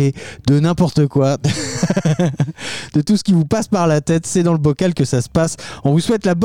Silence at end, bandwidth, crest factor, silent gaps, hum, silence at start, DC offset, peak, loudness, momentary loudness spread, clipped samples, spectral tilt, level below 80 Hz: 0 s; 13.5 kHz; 12 dB; none; none; 0 s; 0.6%; -4 dBFS; -17 LUFS; 5 LU; under 0.1%; -6 dB/octave; -42 dBFS